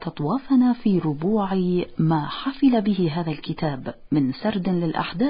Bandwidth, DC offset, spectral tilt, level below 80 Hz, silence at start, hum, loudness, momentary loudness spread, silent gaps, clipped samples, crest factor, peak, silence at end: 5.2 kHz; under 0.1%; -12 dB/octave; -52 dBFS; 0 s; none; -23 LUFS; 8 LU; none; under 0.1%; 14 dB; -8 dBFS; 0 s